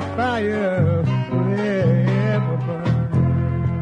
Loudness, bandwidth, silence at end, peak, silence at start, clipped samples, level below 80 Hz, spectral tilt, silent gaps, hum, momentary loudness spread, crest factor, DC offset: -20 LUFS; 6.6 kHz; 0 s; -6 dBFS; 0 s; under 0.1%; -44 dBFS; -9 dB/octave; none; none; 4 LU; 12 dB; under 0.1%